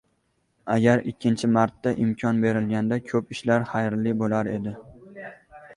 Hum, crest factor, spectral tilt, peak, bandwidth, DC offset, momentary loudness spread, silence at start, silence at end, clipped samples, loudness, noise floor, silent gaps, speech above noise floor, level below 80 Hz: none; 18 dB; -7 dB/octave; -6 dBFS; 11 kHz; under 0.1%; 19 LU; 0.65 s; 0 s; under 0.1%; -24 LUFS; -70 dBFS; none; 47 dB; -60 dBFS